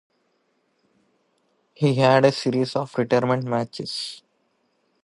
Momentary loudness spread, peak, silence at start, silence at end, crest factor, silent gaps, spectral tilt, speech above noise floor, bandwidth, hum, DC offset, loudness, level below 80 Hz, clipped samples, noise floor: 13 LU; -4 dBFS; 1.8 s; 0.85 s; 20 dB; none; -6 dB/octave; 48 dB; 11.5 kHz; none; under 0.1%; -22 LUFS; -70 dBFS; under 0.1%; -69 dBFS